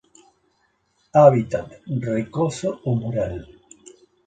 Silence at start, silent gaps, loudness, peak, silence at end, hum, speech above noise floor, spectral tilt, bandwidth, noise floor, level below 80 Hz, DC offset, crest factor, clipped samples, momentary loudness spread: 1.15 s; none; -21 LUFS; 0 dBFS; 0.85 s; none; 47 dB; -7.5 dB/octave; 9.2 kHz; -67 dBFS; -50 dBFS; under 0.1%; 22 dB; under 0.1%; 15 LU